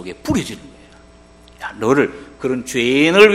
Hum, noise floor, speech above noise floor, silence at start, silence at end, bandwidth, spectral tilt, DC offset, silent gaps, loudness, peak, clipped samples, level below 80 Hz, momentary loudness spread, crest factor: 60 Hz at -45 dBFS; -45 dBFS; 29 dB; 0 s; 0 s; 14.5 kHz; -4.5 dB/octave; under 0.1%; none; -17 LUFS; 0 dBFS; 0.2%; -46 dBFS; 18 LU; 18 dB